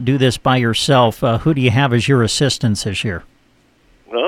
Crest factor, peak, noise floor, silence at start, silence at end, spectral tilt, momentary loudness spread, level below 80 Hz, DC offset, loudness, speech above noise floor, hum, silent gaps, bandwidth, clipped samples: 14 dB; -2 dBFS; -55 dBFS; 0 s; 0 s; -5 dB/octave; 8 LU; -42 dBFS; under 0.1%; -15 LUFS; 40 dB; none; none; 15 kHz; under 0.1%